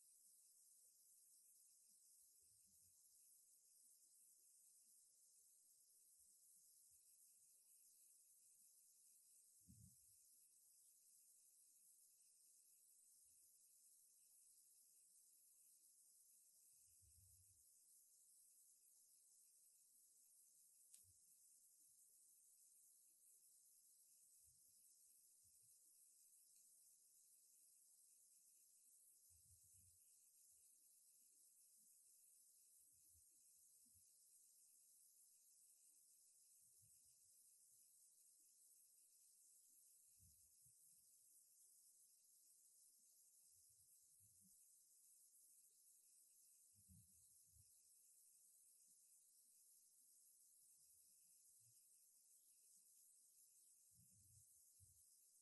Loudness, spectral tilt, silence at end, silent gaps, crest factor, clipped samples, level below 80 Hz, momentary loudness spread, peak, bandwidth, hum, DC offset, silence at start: -69 LUFS; -1 dB/octave; 0 s; none; 30 dB; under 0.1%; under -90 dBFS; 1 LU; -44 dBFS; 12 kHz; none; under 0.1%; 0 s